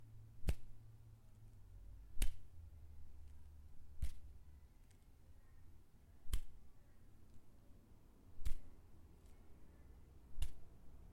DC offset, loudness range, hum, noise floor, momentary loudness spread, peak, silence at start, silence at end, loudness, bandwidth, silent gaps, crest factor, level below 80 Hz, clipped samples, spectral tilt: under 0.1%; 7 LU; none; -63 dBFS; 20 LU; -20 dBFS; 0 s; 0 s; -55 LUFS; 14 kHz; none; 24 dB; -50 dBFS; under 0.1%; -4.5 dB/octave